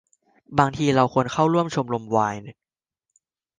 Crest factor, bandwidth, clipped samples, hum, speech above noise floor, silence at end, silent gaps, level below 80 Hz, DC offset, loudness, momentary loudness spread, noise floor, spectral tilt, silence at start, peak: 22 dB; 9.8 kHz; under 0.1%; none; 63 dB; 1.05 s; none; -56 dBFS; under 0.1%; -22 LUFS; 7 LU; -84 dBFS; -6.5 dB/octave; 0.5 s; -2 dBFS